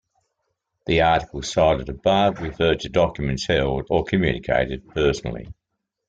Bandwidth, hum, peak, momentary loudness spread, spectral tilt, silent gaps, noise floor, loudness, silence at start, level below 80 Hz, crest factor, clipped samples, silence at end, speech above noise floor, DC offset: 9.2 kHz; none; -4 dBFS; 7 LU; -5.5 dB/octave; none; -80 dBFS; -21 LUFS; 0.85 s; -38 dBFS; 18 dB; under 0.1%; 0.55 s; 59 dB; under 0.1%